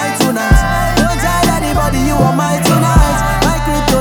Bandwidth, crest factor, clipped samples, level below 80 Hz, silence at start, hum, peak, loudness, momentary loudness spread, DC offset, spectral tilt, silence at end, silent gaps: over 20 kHz; 12 dB; under 0.1%; -18 dBFS; 0 s; none; 0 dBFS; -12 LUFS; 3 LU; under 0.1%; -5 dB/octave; 0 s; none